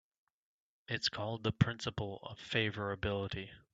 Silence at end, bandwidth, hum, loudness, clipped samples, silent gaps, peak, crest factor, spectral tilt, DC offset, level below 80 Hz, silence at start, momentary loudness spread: 0.15 s; 8 kHz; none; -37 LUFS; under 0.1%; none; -12 dBFS; 26 dB; -5.5 dB/octave; under 0.1%; -60 dBFS; 0.9 s; 9 LU